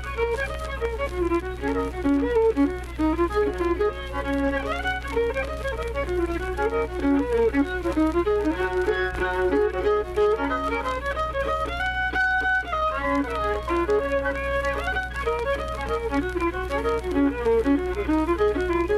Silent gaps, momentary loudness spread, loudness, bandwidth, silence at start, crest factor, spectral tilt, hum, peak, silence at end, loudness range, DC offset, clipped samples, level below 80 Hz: none; 5 LU; -25 LUFS; 13.5 kHz; 0 s; 12 dB; -6.5 dB/octave; none; -12 dBFS; 0 s; 2 LU; under 0.1%; under 0.1%; -34 dBFS